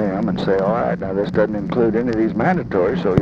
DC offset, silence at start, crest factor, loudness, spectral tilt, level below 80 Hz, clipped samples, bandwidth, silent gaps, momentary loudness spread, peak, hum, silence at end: under 0.1%; 0 s; 18 dB; -19 LUFS; -9 dB/octave; -42 dBFS; under 0.1%; 7.2 kHz; none; 3 LU; 0 dBFS; none; 0 s